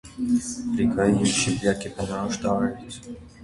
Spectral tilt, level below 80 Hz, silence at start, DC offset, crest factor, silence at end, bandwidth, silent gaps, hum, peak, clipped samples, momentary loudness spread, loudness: -4.5 dB/octave; -48 dBFS; 0.05 s; under 0.1%; 18 dB; 0 s; 11.5 kHz; none; none; -8 dBFS; under 0.1%; 17 LU; -24 LUFS